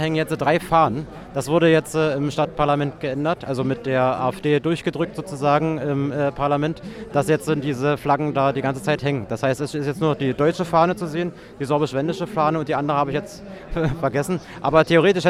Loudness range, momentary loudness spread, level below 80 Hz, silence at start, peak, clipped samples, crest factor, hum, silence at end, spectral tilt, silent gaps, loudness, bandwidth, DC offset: 2 LU; 8 LU; -46 dBFS; 0 s; -2 dBFS; under 0.1%; 18 dB; none; 0 s; -6.5 dB/octave; none; -21 LUFS; 15 kHz; under 0.1%